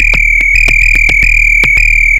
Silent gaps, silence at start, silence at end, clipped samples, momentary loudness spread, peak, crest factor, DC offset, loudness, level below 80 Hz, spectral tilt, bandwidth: none; 0 s; 0 s; 0.7%; 1 LU; 0 dBFS; 8 dB; under 0.1%; -5 LUFS; -14 dBFS; -2.5 dB/octave; 16 kHz